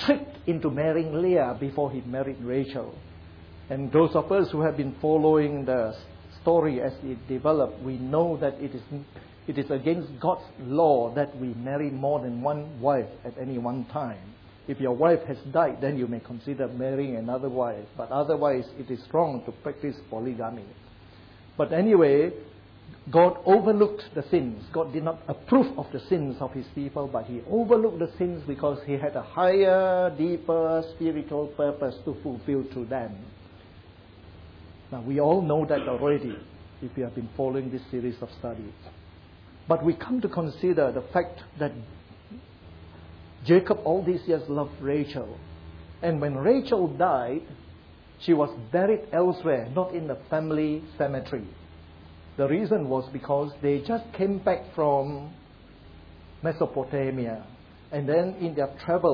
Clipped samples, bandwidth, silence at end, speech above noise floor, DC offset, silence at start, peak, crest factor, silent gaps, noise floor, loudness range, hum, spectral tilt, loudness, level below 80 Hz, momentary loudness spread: under 0.1%; 5.4 kHz; 0 s; 24 dB; under 0.1%; 0 s; -8 dBFS; 18 dB; none; -50 dBFS; 6 LU; none; -10 dB/octave; -26 LUFS; -56 dBFS; 15 LU